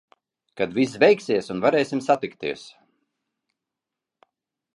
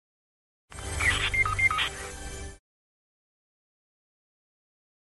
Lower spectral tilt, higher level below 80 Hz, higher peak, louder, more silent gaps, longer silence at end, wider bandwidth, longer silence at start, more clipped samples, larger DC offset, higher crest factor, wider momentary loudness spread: first, -5.5 dB/octave vs -2 dB/octave; second, -66 dBFS vs -44 dBFS; first, -4 dBFS vs -12 dBFS; first, -22 LUFS vs -25 LUFS; neither; second, 2.05 s vs 2.6 s; about the same, 11 kHz vs 12 kHz; second, 0.55 s vs 0.7 s; neither; neither; about the same, 20 dB vs 20 dB; second, 13 LU vs 19 LU